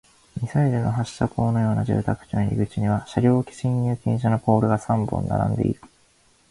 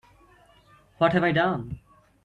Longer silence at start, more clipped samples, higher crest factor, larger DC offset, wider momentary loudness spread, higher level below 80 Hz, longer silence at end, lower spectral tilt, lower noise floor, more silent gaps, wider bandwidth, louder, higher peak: second, 0.35 s vs 1 s; neither; about the same, 18 dB vs 20 dB; neither; second, 6 LU vs 18 LU; first, -44 dBFS vs -56 dBFS; first, 0.65 s vs 0.45 s; about the same, -8.5 dB/octave vs -8 dB/octave; about the same, -59 dBFS vs -57 dBFS; neither; first, 11.5 kHz vs 10 kHz; about the same, -23 LUFS vs -24 LUFS; first, -4 dBFS vs -8 dBFS